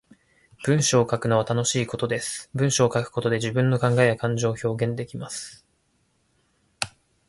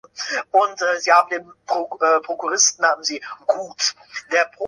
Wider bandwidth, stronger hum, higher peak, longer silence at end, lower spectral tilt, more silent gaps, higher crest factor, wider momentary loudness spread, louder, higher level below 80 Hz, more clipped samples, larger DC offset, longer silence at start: about the same, 11.5 kHz vs 11.5 kHz; neither; about the same, -2 dBFS vs -2 dBFS; first, 0.4 s vs 0 s; first, -4.5 dB/octave vs 1 dB/octave; neither; about the same, 22 dB vs 18 dB; about the same, 12 LU vs 10 LU; second, -24 LUFS vs -19 LUFS; first, -58 dBFS vs -72 dBFS; neither; neither; first, 0.6 s vs 0.15 s